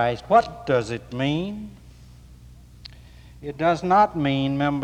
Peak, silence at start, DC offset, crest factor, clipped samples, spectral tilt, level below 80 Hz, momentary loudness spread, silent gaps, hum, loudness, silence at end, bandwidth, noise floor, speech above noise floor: -6 dBFS; 0 s; under 0.1%; 18 dB; under 0.1%; -7 dB/octave; -48 dBFS; 24 LU; none; none; -22 LUFS; 0 s; 10.5 kHz; -46 dBFS; 24 dB